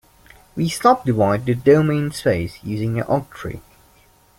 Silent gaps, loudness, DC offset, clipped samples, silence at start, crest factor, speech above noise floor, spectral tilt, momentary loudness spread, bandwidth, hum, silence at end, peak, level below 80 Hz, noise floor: none; -19 LUFS; under 0.1%; under 0.1%; 0.55 s; 18 dB; 35 dB; -6.5 dB/octave; 17 LU; 16.5 kHz; none; 0.8 s; -2 dBFS; -48 dBFS; -54 dBFS